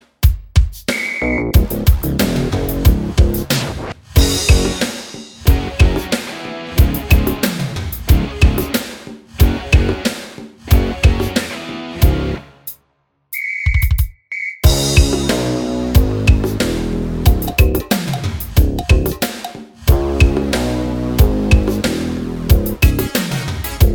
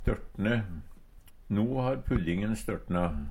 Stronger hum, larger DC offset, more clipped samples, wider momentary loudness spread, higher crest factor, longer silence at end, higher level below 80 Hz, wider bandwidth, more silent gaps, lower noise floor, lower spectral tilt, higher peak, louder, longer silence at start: neither; neither; neither; first, 10 LU vs 5 LU; about the same, 14 dB vs 18 dB; about the same, 0 s vs 0 s; first, -18 dBFS vs -40 dBFS; first, over 20 kHz vs 16 kHz; neither; first, -63 dBFS vs -52 dBFS; second, -5.5 dB/octave vs -7.5 dB/octave; first, 0 dBFS vs -14 dBFS; first, -16 LUFS vs -31 LUFS; first, 0.2 s vs 0 s